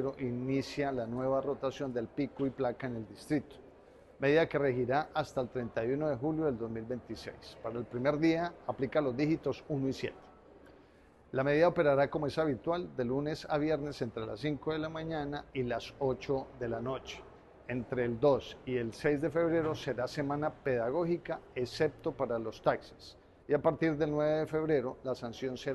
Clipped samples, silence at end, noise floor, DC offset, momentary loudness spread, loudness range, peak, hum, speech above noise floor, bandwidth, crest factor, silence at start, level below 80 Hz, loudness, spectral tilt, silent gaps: under 0.1%; 0 s; -61 dBFS; under 0.1%; 10 LU; 4 LU; -14 dBFS; none; 27 dB; 12.5 kHz; 20 dB; 0 s; -60 dBFS; -34 LUFS; -7 dB/octave; none